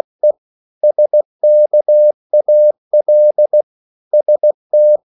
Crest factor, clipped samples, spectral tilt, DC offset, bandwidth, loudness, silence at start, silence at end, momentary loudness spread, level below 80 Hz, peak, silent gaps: 8 dB; under 0.1%; -10.5 dB/octave; under 0.1%; 0.9 kHz; -12 LUFS; 0.25 s; 0.15 s; 6 LU; -84 dBFS; -4 dBFS; 0.38-0.81 s, 1.25-1.39 s, 2.14-2.30 s, 2.78-2.91 s, 3.63-4.11 s, 4.54-4.70 s